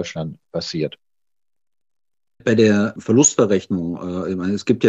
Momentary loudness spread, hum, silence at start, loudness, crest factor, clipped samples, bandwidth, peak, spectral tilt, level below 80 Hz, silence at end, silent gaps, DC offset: 13 LU; none; 0 s; -19 LUFS; 18 dB; under 0.1%; 8.2 kHz; -2 dBFS; -4.5 dB/octave; -56 dBFS; 0 s; none; under 0.1%